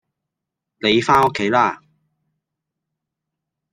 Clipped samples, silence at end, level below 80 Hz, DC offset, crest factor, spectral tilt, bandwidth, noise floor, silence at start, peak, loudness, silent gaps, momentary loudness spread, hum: under 0.1%; 1.95 s; -56 dBFS; under 0.1%; 20 dB; -5 dB/octave; 13 kHz; -83 dBFS; 0.85 s; -2 dBFS; -17 LUFS; none; 8 LU; none